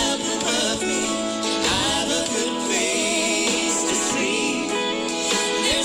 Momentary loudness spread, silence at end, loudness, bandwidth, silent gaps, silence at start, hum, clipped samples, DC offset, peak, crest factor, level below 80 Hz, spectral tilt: 3 LU; 0 s; -21 LUFS; 19.5 kHz; none; 0 s; none; under 0.1%; under 0.1%; -12 dBFS; 10 dB; -50 dBFS; -1.5 dB/octave